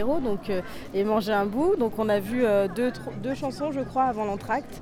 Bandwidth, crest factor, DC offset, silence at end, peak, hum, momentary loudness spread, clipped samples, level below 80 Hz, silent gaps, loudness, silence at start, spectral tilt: 17 kHz; 14 dB; under 0.1%; 0 s; -12 dBFS; none; 7 LU; under 0.1%; -50 dBFS; none; -26 LUFS; 0 s; -6.5 dB/octave